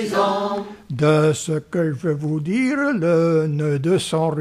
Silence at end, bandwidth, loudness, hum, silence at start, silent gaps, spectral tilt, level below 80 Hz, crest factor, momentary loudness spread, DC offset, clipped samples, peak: 0 s; 13.5 kHz; -20 LUFS; none; 0 s; none; -6.5 dB/octave; -58 dBFS; 14 dB; 7 LU; under 0.1%; under 0.1%; -4 dBFS